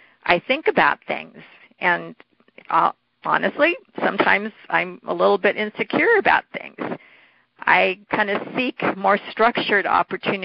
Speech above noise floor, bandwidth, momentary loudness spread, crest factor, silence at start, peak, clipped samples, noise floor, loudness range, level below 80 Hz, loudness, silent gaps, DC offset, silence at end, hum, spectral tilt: 34 dB; 5.6 kHz; 12 LU; 20 dB; 0.25 s; -2 dBFS; under 0.1%; -54 dBFS; 2 LU; -62 dBFS; -20 LUFS; none; under 0.1%; 0 s; none; -9 dB/octave